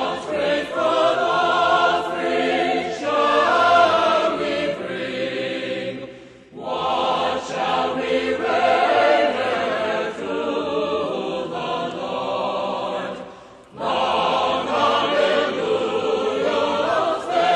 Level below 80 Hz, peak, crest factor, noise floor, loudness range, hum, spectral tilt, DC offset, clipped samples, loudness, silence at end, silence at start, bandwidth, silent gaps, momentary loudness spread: -60 dBFS; -4 dBFS; 16 dB; -42 dBFS; 6 LU; none; -4 dB/octave; under 0.1%; under 0.1%; -20 LUFS; 0 s; 0 s; 10.5 kHz; none; 10 LU